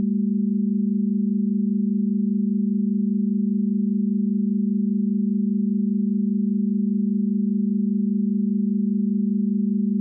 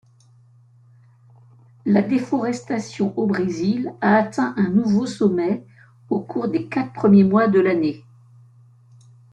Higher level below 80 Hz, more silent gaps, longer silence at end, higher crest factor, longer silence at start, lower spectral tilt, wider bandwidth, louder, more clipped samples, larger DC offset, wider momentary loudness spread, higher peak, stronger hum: second, -82 dBFS vs -62 dBFS; neither; second, 0 s vs 1.3 s; second, 6 dB vs 16 dB; second, 0 s vs 1.85 s; first, -24.5 dB/octave vs -7.5 dB/octave; second, 0.4 kHz vs 9 kHz; about the same, -22 LUFS vs -20 LUFS; neither; neither; second, 0 LU vs 11 LU; second, -14 dBFS vs -4 dBFS; neither